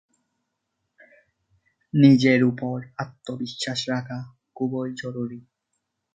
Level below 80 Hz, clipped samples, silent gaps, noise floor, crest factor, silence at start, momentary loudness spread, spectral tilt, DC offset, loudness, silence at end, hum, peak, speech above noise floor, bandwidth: -68 dBFS; under 0.1%; none; -79 dBFS; 22 dB; 1.95 s; 18 LU; -6.5 dB/octave; under 0.1%; -23 LUFS; 0.75 s; none; -4 dBFS; 56 dB; 9.2 kHz